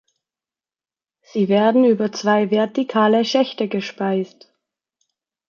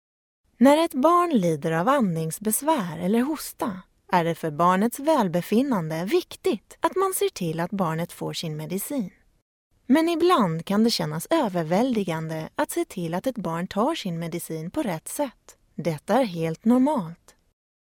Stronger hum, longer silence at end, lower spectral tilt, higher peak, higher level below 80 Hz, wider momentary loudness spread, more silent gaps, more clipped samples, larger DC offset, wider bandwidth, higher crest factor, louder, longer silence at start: neither; first, 1.25 s vs 0.75 s; about the same, -6 dB/octave vs -5.5 dB/octave; about the same, -4 dBFS vs -4 dBFS; second, -72 dBFS vs -62 dBFS; about the same, 9 LU vs 10 LU; second, none vs 9.42-9.71 s; neither; neither; second, 7 kHz vs 18 kHz; about the same, 16 dB vs 20 dB; first, -18 LUFS vs -24 LUFS; first, 1.35 s vs 0.6 s